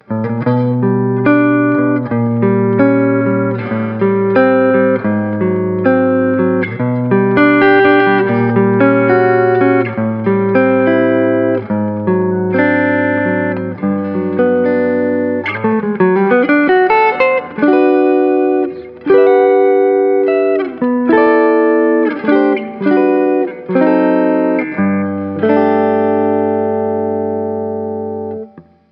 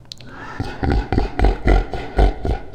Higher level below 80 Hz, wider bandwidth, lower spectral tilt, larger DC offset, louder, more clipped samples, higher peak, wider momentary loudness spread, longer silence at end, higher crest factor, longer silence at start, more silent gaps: second, -58 dBFS vs -20 dBFS; second, 5.2 kHz vs 8.6 kHz; first, -10.5 dB/octave vs -7.5 dB/octave; neither; first, -13 LUFS vs -21 LUFS; neither; about the same, 0 dBFS vs 0 dBFS; second, 7 LU vs 14 LU; first, 0.3 s vs 0 s; second, 12 dB vs 18 dB; about the same, 0.1 s vs 0.05 s; neither